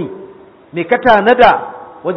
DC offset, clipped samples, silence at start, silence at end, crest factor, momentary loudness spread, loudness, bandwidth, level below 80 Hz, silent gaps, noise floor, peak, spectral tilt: under 0.1%; 0.1%; 0 s; 0 s; 14 dB; 18 LU; -10 LUFS; 6.2 kHz; -44 dBFS; none; -38 dBFS; 0 dBFS; -6.5 dB/octave